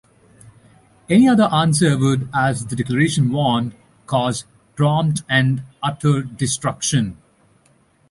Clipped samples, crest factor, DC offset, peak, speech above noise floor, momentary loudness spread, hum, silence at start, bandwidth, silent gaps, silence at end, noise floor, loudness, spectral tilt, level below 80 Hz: under 0.1%; 16 dB; under 0.1%; -4 dBFS; 40 dB; 9 LU; none; 1.1 s; 11.5 kHz; none; 0.95 s; -57 dBFS; -18 LUFS; -5.5 dB/octave; -50 dBFS